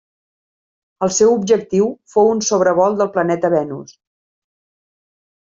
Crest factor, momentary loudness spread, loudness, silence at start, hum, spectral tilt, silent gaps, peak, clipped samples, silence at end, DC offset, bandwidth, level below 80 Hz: 16 dB; 6 LU; -16 LUFS; 1 s; none; -4.5 dB/octave; none; -2 dBFS; under 0.1%; 1.6 s; under 0.1%; 7.8 kHz; -60 dBFS